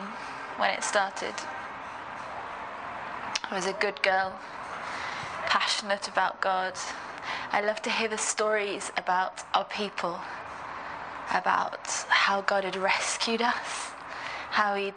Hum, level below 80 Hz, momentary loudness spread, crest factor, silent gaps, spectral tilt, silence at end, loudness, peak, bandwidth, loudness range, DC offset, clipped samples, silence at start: none; -68 dBFS; 12 LU; 22 dB; none; -1.5 dB/octave; 0 s; -29 LUFS; -8 dBFS; 10 kHz; 4 LU; under 0.1%; under 0.1%; 0 s